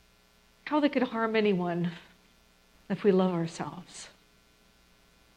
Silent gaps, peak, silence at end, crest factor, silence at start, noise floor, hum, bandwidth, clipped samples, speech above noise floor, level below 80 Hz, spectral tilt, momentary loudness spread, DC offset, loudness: none; -12 dBFS; 1.3 s; 20 dB; 0.65 s; -63 dBFS; none; 10.5 kHz; under 0.1%; 35 dB; -68 dBFS; -6.5 dB/octave; 20 LU; under 0.1%; -29 LUFS